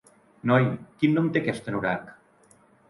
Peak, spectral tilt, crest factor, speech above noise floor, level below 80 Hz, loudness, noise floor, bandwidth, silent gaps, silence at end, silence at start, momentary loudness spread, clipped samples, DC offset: -8 dBFS; -8 dB/octave; 18 dB; 34 dB; -64 dBFS; -25 LUFS; -59 dBFS; 11.5 kHz; none; 0.8 s; 0.45 s; 8 LU; under 0.1%; under 0.1%